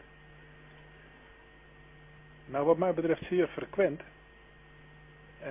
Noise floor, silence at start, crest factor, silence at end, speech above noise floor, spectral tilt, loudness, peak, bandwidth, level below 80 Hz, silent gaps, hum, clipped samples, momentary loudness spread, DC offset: -56 dBFS; 2.45 s; 22 dB; 0 s; 27 dB; -6 dB/octave; -30 LUFS; -12 dBFS; 3.8 kHz; -62 dBFS; none; none; under 0.1%; 27 LU; under 0.1%